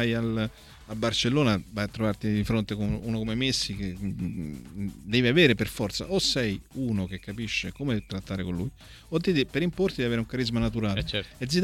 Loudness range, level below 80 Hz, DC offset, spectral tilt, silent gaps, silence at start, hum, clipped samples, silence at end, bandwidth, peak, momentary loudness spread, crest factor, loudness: 4 LU; -46 dBFS; under 0.1%; -5 dB/octave; none; 0 s; none; under 0.1%; 0 s; 16.5 kHz; -6 dBFS; 11 LU; 20 dB; -28 LUFS